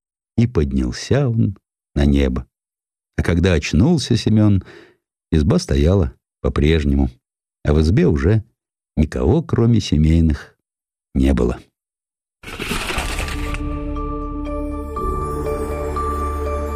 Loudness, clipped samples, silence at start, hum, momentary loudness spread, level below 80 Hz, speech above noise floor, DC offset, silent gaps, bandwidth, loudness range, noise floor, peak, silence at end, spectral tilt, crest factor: -19 LUFS; under 0.1%; 0.35 s; none; 11 LU; -26 dBFS; over 74 dB; under 0.1%; none; 14.5 kHz; 7 LU; under -90 dBFS; -4 dBFS; 0 s; -7 dB/octave; 16 dB